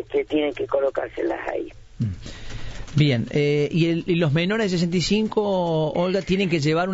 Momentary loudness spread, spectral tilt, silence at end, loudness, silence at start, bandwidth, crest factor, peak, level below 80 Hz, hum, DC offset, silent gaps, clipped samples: 10 LU; -6.5 dB/octave; 0 s; -22 LUFS; 0 s; 8 kHz; 14 dB; -8 dBFS; -44 dBFS; none; under 0.1%; none; under 0.1%